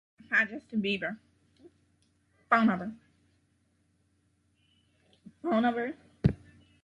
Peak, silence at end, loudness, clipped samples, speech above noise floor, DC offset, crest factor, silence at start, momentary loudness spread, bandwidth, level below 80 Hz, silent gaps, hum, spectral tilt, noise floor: -10 dBFS; 0.5 s; -30 LUFS; under 0.1%; 43 dB; under 0.1%; 24 dB; 0.3 s; 14 LU; 7.6 kHz; -54 dBFS; none; none; -7.5 dB/octave; -72 dBFS